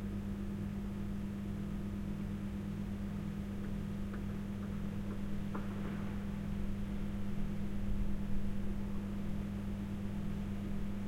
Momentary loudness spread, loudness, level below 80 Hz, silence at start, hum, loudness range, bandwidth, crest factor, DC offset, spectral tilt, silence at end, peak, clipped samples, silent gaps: 1 LU; -41 LUFS; -44 dBFS; 0 s; none; 1 LU; 16 kHz; 14 dB; under 0.1%; -8 dB/octave; 0 s; -24 dBFS; under 0.1%; none